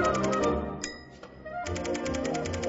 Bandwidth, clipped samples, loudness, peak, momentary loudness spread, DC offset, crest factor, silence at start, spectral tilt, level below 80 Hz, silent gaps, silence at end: 8 kHz; under 0.1%; -31 LUFS; -14 dBFS; 17 LU; under 0.1%; 16 dB; 0 s; -5 dB/octave; -46 dBFS; none; 0 s